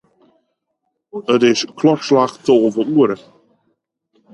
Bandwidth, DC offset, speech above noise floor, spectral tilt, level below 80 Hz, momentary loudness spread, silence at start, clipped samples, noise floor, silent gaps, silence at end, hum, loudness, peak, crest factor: 10.5 kHz; under 0.1%; 58 dB; -5.5 dB/octave; -66 dBFS; 11 LU; 1.15 s; under 0.1%; -73 dBFS; none; 1.2 s; none; -15 LUFS; 0 dBFS; 16 dB